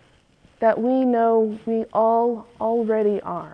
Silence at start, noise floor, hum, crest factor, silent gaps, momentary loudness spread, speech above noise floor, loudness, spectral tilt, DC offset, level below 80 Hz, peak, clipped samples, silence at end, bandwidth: 0.6 s; -56 dBFS; none; 16 dB; none; 6 LU; 36 dB; -21 LUFS; -9 dB/octave; under 0.1%; -62 dBFS; -6 dBFS; under 0.1%; 0 s; 5.4 kHz